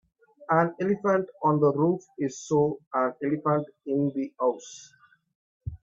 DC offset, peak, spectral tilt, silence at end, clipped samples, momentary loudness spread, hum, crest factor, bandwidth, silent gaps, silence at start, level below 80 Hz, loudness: under 0.1%; -8 dBFS; -7.5 dB/octave; 0.05 s; under 0.1%; 12 LU; none; 18 dB; 7.8 kHz; 2.87-2.91 s, 5.35-5.60 s; 0.5 s; -58 dBFS; -26 LUFS